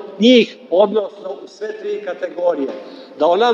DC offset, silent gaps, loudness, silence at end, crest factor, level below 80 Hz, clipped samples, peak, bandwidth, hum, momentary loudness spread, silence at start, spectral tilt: under 0.1%; none; -17 LUFS; 0 s; 16 dB; -78 dBFS; under 0.1%; 0 dBFS; 7.4 kHz; none; 19 LU; 0 s; -5.5 dB/octave